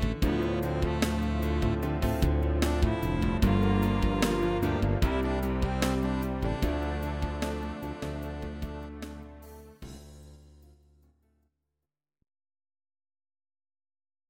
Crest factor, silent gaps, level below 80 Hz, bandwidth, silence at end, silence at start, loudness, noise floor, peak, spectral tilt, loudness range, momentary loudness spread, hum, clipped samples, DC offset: 20 dB; none; -34 dBFS; 17 kHz; 3.9 s; 0 s; -29 LUFS; -88 dBFS; -10 dBFS; -6.5 dB/octave; 16 LU; 16 LU; none; under 0.1%; under 0.1%